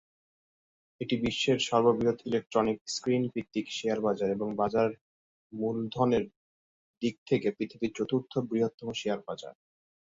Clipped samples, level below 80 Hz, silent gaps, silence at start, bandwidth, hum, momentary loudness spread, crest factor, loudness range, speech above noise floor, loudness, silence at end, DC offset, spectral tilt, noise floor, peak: under 0.1%; -64 dBFS; 2.81-2.85 s, 5.01-5.50 s, 6.36-7.01 s, 7.18-7.26 s, 8.74-8.78 s; 1 s; 8 kHz; none; 9 LU; 20 dB; 4 LU; over 60 dB; -30 LUFS; 0.55 s; under 0.1%; -5.5 dB/octave; under -90 dBFS; -10 dBFS